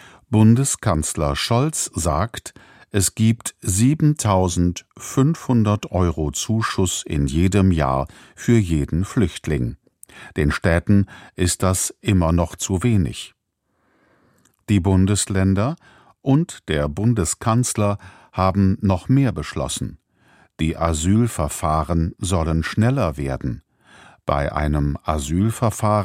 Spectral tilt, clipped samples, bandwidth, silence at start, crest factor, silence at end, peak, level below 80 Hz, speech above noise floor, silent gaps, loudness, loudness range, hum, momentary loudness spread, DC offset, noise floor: -5.5 dB/octave; under 0.1%; 16 kHz; 0.3 s; 18 dB; 0 s; -2 dBFS; -34 dBFS; 51 dB; none; -20 LUFS; 3 LU; none; 9 LU; under 0.1%; -70 dBFS